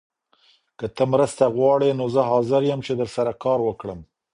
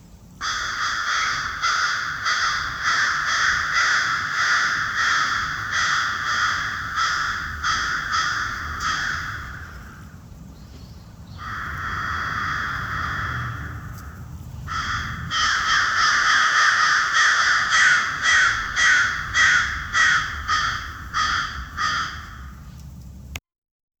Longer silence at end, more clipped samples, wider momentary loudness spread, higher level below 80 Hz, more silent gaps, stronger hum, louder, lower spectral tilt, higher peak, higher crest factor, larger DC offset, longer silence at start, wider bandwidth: second, 0.3 s vs 0.6 s; neither; second, 15 LU vs 20 LU; second, -56 dBFS vs -42 dBFS; neither; neither; about the same, -21 LUFS vs -20 LUFS; first, -6.5 dB/octave vs -1 dB/octave; about the same, -4 dBFS vs -4 dBFS; about the same, 18 dB vs 18 dB; neither; first, 0.8 s vs 0.05 s; second, 11 kHz vs over 20 kHz